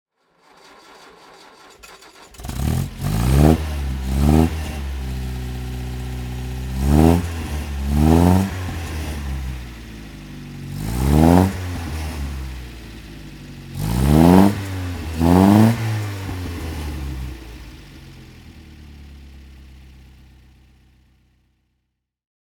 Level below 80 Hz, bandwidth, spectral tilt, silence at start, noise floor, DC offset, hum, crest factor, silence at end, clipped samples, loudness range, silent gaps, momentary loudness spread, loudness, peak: -28 dBFS; 19.5 kHz; -7 dB/octave; 1.85 s; -75 dBFS; under 0.1%; none; 20 dB; 2.65 s; under 0.1%; 13 LU; none; 23 LU; -19 LUFS; 0 dBFS